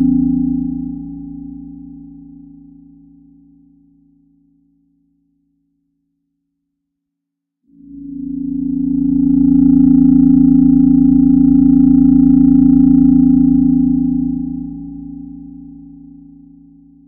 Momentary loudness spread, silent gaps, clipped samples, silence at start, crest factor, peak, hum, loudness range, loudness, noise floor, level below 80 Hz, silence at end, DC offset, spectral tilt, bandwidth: 21 LU; none; under 0.1%; 0 s; 14 dB; 0 dBFS; none; 17 LU; -11 LUFS; -78 dBFS; -34 dBFS; 1.35 s; under 0.1%; -15 dB/octave; 1.4 kHz